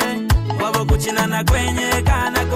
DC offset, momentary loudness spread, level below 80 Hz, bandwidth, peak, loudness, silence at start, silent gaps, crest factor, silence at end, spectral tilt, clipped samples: under 0.1%; 2 LU; -24 dBFS; 16.5 kHz; -6 dBFS; -18 LUFS; 0 s; none; 12 dB; 0 s; -4.5 dB/octave; under 0.1%